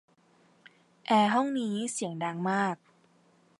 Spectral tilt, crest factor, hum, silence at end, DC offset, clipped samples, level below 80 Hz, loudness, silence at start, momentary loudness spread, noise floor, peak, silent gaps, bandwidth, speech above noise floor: -4.5 dB/octave; 20 dB; none; 0.85 s; under 0.1%; under 0.1%; -82 dBFS; -29 LUFS; 1.1 s; 9 LU; -64 dBFS; -12 dBFS; none; 11.5 kHz; 36 dB